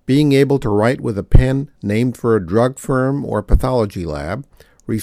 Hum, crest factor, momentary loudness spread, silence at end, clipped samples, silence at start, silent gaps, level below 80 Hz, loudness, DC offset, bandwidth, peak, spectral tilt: none; 16 dB; 11 LU; 0 s; under 0.1%; 0.1 s; none; -22 dBFS; -17 LUFS; under 0.1%; 14.5 kHz; 0 dBFS; -7.5 dB/octave